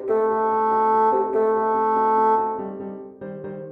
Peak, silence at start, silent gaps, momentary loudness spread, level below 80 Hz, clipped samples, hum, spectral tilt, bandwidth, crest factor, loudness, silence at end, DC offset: -10 dBFS; 0 s; none; 16 LU; -68 dBFS; under 0.1%; none; -8.5 dB/octave; 4.9 kHz; 12 dB; -20 LUFS; 0 s; under 0.1%